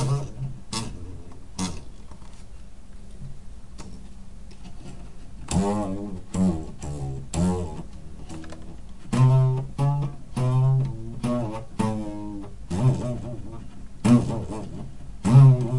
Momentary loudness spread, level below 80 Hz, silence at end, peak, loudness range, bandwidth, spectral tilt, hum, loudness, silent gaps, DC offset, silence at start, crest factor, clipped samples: 24 LU; -42 dBFS; 0 s; -4 dBFS; 15 LU; 11.5 kHz; -7.5 dB/octave; none; -24 LUFS; none; 1%; 0 s; 20 dB; under 0.1%